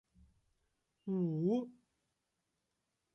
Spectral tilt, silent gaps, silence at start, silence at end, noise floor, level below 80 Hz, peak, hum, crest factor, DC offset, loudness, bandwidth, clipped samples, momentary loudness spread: -10.5 dB/octave; none; 1.05 s; 1.45 s; -86 dBFS; -78 dBFS; -24 dBFS; none; 18 dB; under 0.1%; -37 LUFS; 6.4 kHz; under 0.1%; 16 LU